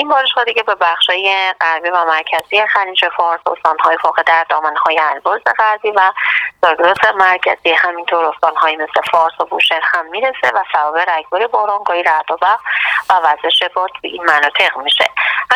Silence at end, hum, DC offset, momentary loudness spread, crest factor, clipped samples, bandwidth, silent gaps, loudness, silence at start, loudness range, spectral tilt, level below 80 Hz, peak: 0 s; none; under 0.1%; 4 LU; 14 dB; under 0.1%; 16.5 kHz; none; -13 LUFS; 0 s; 2 LU; -1.5 dB/octave; -60 dBFS; 0 dBFS